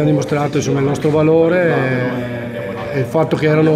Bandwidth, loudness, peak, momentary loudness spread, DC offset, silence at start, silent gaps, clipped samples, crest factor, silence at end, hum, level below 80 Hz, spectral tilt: 13.5 kHz; -16 LUFS; -2 dBFS; 11 LU; under 0.1%; 0 s; none; under 0.1%; 14 dB; 0 s; none; -48 dBFS; -7 dB/octave